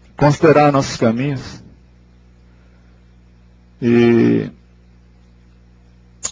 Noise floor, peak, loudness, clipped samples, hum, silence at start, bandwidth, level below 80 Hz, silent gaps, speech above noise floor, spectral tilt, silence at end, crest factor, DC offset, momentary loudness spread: -47 dBFS; 0 dBFS; -15 LUFS; under 0.1%; 60 Hz at -40 dBFS; 0.2 s; 7.8 kHz; -46 dBFS; none; 34 dB; -6.5 dB/octave; 0 s; 18 dB; under 0.1%; 16 LU